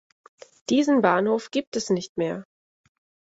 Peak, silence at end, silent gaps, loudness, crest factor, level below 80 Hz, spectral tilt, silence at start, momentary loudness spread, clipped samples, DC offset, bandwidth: -4 dBFS; 0.85 s; 1.67-1.72 s, 2.09-2.15 s; -24 LUFS; 20 dB; -68 dBFS; -5 dB/octave; 0.7 s; 10 LU; under 0.1%; under 0.1%; 8 kHz